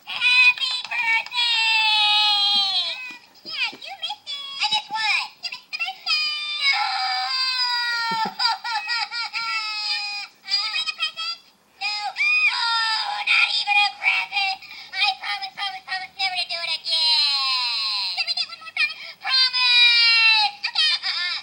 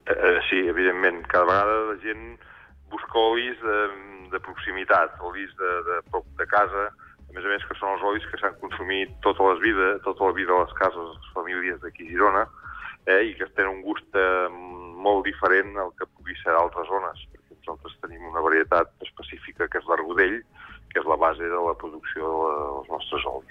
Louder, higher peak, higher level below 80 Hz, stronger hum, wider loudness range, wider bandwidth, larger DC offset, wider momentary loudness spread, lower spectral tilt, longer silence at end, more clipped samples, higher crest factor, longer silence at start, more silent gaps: first, -19 LUFS vs -24 LUFS; first, -4 dBFS vs -8 dBFS; second, -82 dBFS vs -50 dBFS; neither; first, 7 LU vs 3 LU; first, 16 kHz vs 6.2 kHz; neither; about the same, 14 LU vs 15 LU; second, 1.5 dB/octave vs -6.5 dB/octave; about the same, 0 s vs 0.1 s; neither; about the same, 18 dB vs 16 dB; about the same, 0.05 s vs 0.05 s; neither